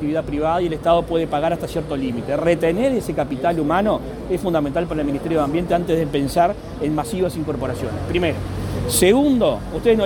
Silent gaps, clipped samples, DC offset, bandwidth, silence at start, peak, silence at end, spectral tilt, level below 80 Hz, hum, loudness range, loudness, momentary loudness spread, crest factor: none; under 0.1%; under 0.1%; 19 kHz; 0 s; -2 dBFS; 0 s; -5.5 dB/octave; -36 dBFS; none; 1 LU; -20 LUFS; 7 LU; 18 dB